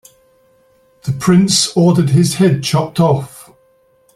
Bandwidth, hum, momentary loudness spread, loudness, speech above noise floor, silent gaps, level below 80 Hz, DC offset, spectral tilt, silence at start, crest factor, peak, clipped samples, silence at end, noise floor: 14.5 kHz; none; 11 LU; -13 LUFS; 42 dB; none; -50 dBFS; under 0.1%; -5.5 dB/octave; 1.05 s; 14 dB; 0 dBFS; under 0.1%; 0.75 s; -54 dBFS